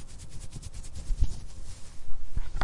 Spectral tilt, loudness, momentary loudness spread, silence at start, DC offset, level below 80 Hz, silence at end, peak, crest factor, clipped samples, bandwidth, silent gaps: -4.5 dB/octave; -40 LUFS; 14 LU; 0 s; under 0.1%; -34 dBFS; 0 s; -10 dBFS; 16 dB; under 0.1%; 11.5 kHz; none